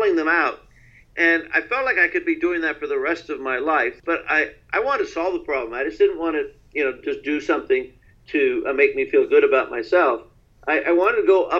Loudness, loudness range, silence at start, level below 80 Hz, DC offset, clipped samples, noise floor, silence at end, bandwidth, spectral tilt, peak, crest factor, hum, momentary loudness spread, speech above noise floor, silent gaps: -21 LUFS; 4 LU; 0 s; -54 dBFS; under 0.1%; under 0.1%; -51 dBFS; 0 s; 7.2 kHz; -5 dB/octave; -4 dBFS; 18 dB; none; 9 LU; 30 dB; none